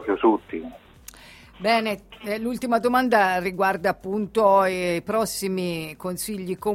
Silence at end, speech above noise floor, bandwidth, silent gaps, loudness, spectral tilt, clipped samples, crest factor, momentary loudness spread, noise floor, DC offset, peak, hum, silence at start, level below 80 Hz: 0 s; 24 dB; 16.5 kHz; none; -23 LUFS; -4.5 dB/octave; under 0.1%; 18 dB; 13 LU; -47 dBFS; under 0.1%; -6 dBFS; none; 0 s; -54 dBFS